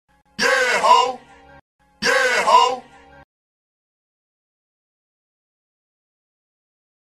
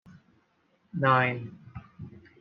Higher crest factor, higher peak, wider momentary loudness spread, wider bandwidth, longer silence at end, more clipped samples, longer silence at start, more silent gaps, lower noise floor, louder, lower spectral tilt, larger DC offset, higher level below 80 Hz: about the same, 20 dB vs 22 dB; first, -2 dBFS vs -8 dBFS; second, 16 LU vs 24 LU; first, 13 kHz vs 5.4 kHz; first, 4.25 s vs 0.2 s; neither; second, 0.4 s vs 0.95 s; first, 1.61-1.79 s vs none; second, -42 dBFS vs -69 dBFS; first, -16 LUFS vs -26 LUFS; second, -1 dB/octave vs -4.5 dB/octave; neither; about the same, -62 dBFS vs -66 dBFS